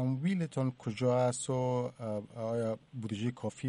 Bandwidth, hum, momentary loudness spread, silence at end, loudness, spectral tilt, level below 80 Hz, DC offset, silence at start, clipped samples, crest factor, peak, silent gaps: 11 kHz; none; 9 LU; 0 s; -34 LUFS; -6.5 dB/octave; -70 dBFS; under 0.1%; 0 s; under 0.1%; 14 dB; -18 dBFS; none